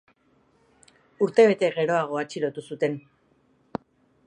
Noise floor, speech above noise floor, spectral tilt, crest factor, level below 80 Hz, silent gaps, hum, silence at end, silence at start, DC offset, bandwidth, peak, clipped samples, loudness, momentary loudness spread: -64 dBFS; 41 dB; -6 dB/octave; 22 dB; -72 dBFS; none; none; 1.25 s; 1.2 s; under 0.1%; 10 kHz; -6 dBFS; under 0.1%; -24 LUFS; 20 LU